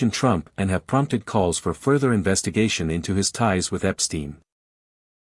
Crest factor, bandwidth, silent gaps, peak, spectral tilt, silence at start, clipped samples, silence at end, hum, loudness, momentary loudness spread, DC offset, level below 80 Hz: 18 dB; 12 kHz; none; -4 dBFS; -4.5 dB/octave; 0 s; under 0.1%; 0.85 s; none; -22 LUFS; 4 LU; under 0.1%; -50 dBFS